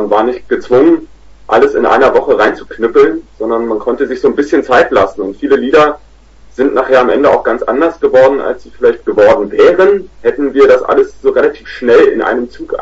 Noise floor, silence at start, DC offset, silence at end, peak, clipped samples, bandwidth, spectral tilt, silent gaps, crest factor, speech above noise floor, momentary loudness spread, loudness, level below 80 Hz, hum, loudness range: -38 dBFS; 0 s; under 0.1%; 0 s; 0 dBFS; 0.2%; 7.8 kHz; -6 dB/octave; none; 10 dB; 29 dB; 8 LU; -10 LUFS; -40 dBFS; none; 2 LU